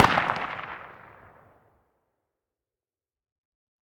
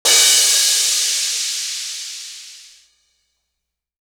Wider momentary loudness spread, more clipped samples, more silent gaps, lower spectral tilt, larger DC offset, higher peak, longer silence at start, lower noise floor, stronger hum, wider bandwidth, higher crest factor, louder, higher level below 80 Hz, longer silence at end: first, 26 LU vs 20 LU; neither; neither; first, -4.5 dB/octave vs 4 dB/octave; neither; about the same, -4 dBFS vs -2 dBFS; about the same, 0 s vs 0.05 s; first, under -90 dBFS vs -79 dBFS; neither; about the same, 19 kHz vs over 20 kHz; first, 26 dB vs 18 dB; second, -27 LUFS vs -14 LUFS; first, -58 dBFS vs -68 dBFS; first, 3 s vs 1.4 s